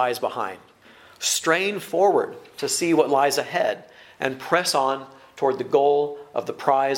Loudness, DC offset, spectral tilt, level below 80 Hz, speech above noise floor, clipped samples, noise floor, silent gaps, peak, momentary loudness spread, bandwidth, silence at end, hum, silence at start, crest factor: -23 LUFS; under 0.1%; -3 dB/octave; -72 dBFS; 28 dB; under 0.1%; -50 dBFS; none; -2 dBFS; 11 LU; 16.5 kHz; 0 s; none; 0 s; 20 dB